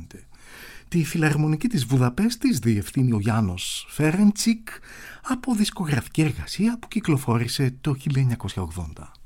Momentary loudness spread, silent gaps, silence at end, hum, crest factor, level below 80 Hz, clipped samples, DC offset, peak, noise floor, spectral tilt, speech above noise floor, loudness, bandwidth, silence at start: 13 LU; none; 0 s; none; 16 dB; -46 dBFS; under 0.1%; under 0.1%; -8 dBFS; -45 dBFS; -5.5 dB/octave; 22 dB; -23 LUFS; 17 kHz; 0 s